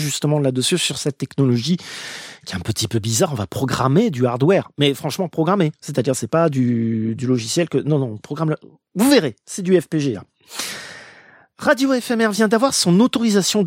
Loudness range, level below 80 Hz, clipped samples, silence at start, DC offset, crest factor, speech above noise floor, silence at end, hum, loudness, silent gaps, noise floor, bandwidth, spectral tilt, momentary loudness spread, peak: 2 LU; -56 dBFS; under 0.1%; 0 s; under 0.1%; 18 dB; 29 dB; 0 s; none; -19 LUFS; none; -48 dBFS; 16.5 kHz; -5 dB/octave; 12 LU; -2 dBFS